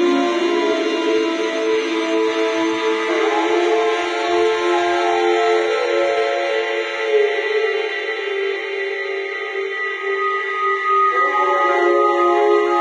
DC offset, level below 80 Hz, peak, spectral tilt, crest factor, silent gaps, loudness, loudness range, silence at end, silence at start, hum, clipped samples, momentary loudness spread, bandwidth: under 0.1%; -74 dBFS; -4 dBFS; -2.5 dB/octave; 14 dB; none; -18 LUFS; 3 LU; 0 s; 0 s; none; under 0.1%; 7 LU; 9.8 kHz